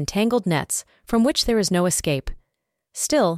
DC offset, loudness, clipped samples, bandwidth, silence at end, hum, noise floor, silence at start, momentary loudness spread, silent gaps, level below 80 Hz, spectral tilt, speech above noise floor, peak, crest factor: under 0.1%; -21 LUFS; under 0.1%; 16 kHz; 0 s; none; -78 dBFS; 0 s; 8 LU; none; -40 dBFS; -4 dB/octave; 57 dB; -8 dBFS; 14 dB